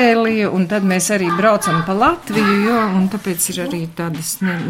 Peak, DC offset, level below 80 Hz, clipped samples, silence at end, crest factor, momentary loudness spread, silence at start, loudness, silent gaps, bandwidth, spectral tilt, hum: -2 dBFS; under 0.1%; -48 dBFS; under 0.1%; 0 s; 14 dB; 8 LU; 0 s; -16 LUFS; none; 16.5 kHz; -4.5 dB/octave; none